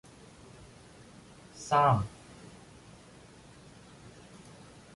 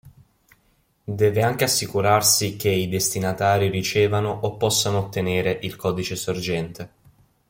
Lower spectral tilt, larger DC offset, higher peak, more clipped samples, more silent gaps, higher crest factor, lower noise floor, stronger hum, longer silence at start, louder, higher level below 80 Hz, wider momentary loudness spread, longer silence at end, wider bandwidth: first, -6 dB/octave vs -3.5 dB/octave; neither; second, -14 dBFS vs -4 dBFS; neither; neither; about the same, 22 dB vs 18 dB; second, -54 dBFS vs -64 dBFS; first, 60 Hz at -55 dBFS vs none; first, 1.55 s vs 0.05 s; second, -28 LUFS vs -21 LUFS; second, -60 dBFS vs -54 dBFS; first, 27 LU vs 9 LU; first, 2.85 s vs 0.6 s; second, 11.5 kHz vs 17 kHz